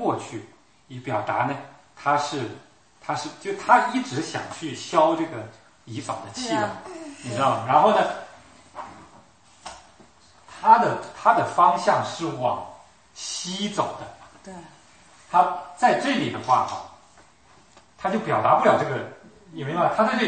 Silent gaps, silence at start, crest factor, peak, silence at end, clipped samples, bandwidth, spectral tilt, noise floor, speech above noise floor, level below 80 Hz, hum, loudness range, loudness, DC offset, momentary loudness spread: none; 0 s; 22 dB; -2 dBFS; 0 s; under 0.1%; 8.8 kHz; -4.5 dB/octave; -55 dBFS; 32 dB; -66 dBFS; none; 6 LU; -23 LUFS; under 0.1%; 23 LU